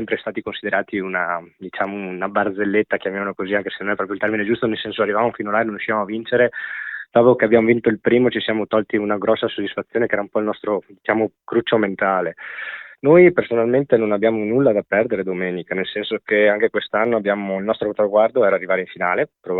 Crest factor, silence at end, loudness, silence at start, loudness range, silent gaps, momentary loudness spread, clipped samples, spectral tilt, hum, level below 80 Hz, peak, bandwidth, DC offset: 18 dB; 0 s; -19 LUFS; 0 s; 5 LU; none; 10 LU; under 0.1%; -9.5 dB/octave; none; -58 dBFS; 0 dBFS; 4.2 kHz; under 0.1%